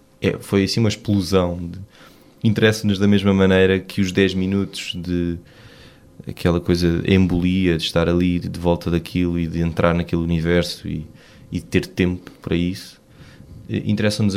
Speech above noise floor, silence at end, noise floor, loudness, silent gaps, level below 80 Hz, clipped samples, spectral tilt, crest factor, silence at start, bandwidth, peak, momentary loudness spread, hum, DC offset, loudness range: 27 dB; 0 s; -46 dBFS; -20 LUFS; none; -40 dBFS; under 0.1%; -6.5 dB/octave; 18 dB; 0.2 s; 15 kHz; -2 dBFS; 13 LU; none; under 0.1%; 5 LU